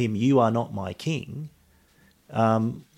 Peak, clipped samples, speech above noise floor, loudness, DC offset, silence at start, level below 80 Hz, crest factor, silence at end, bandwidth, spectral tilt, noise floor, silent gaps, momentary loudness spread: -8 dBFS; under 0.1%; 36 dB; -25 LUFS; under 0.1%; 0 s; -62 dBFS; 18 dB; 0.15 s; 13.5 kHz; -7.5 dB/octave; -60 dBFS; none; 17 LU